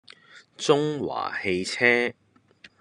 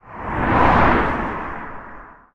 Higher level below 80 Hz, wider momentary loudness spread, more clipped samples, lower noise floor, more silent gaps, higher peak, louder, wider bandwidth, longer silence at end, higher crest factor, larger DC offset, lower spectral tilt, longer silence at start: second, -68 dBFS vs -30 dBFS; second, 9 LU vs 21 LU; neither; first, -55 dBFS vs -40 dBFS; neither; about the same, -4 dBFS vs -2 dBFS; second, -24 LUFS vs -18 LUFS; first, 11 kHz vs 9.4 kHz; about the same, 0.15 s vs 0.2 s; about the same, 22 dB vs 18 dB; neither; second, -4 dB/octave vs -8 dB/octave; first, 0.35 s vs 0.05 s